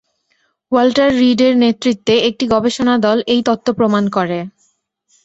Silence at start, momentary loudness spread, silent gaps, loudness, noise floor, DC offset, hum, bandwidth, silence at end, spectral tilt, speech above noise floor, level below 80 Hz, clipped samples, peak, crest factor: 0.7 s; 6 LU; none; -14 LUFS; -63 dBFS; under 0.1%; none; 8 kHz; 0.75 s; -5.5 dB/octave; 50 dB; -52 dBFS; under 0.1%; -2 dBFS; 14 dB